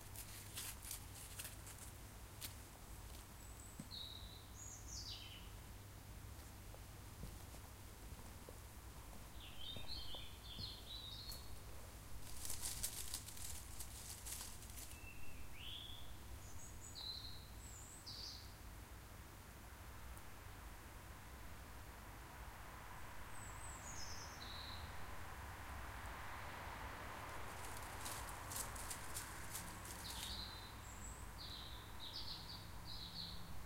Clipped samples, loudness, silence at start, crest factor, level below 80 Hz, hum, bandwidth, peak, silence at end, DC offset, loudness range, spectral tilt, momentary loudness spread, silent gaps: under 0.1%; -52 LUFS; 0 s; 24 dB; -58 dBFS; none; 16 kHz; -26 dBFS; 0 s; under 0.1%; 7 LU; -2.5 dB/octave; 9 LU; none